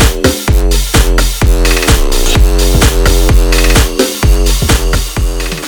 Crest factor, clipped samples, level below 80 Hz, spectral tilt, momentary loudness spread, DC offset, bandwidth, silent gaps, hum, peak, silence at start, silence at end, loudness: 8 dB; 0.2%; -10 dBFS; -4 dB/octave; 3 LU; under 0.1%; over 20 kHz; none; none; 0 dBFS; 0 s; 0 s; -10 LUFS